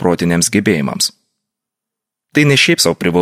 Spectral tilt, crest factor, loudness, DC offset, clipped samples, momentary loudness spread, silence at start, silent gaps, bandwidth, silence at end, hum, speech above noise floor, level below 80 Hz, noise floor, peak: -4 dB/octave; 14 dB; -13 LUFS; under 0.1%; under 0.1%; 8 LU; 0 s; none; 16 kHz; 0 s; none; 69 dB; -48 dBFS; -82 dBFS; 0 dBFS